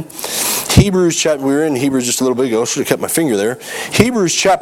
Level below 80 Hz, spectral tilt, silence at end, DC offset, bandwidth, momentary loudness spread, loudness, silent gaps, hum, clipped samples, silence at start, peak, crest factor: -34 dBFS; -4 dB/octave; 0 s; under 0.1%; 19 kHz; 6 LU; -14 LUFS; none; none; 0.2%; 0 s; 0 dBFS; 14 dB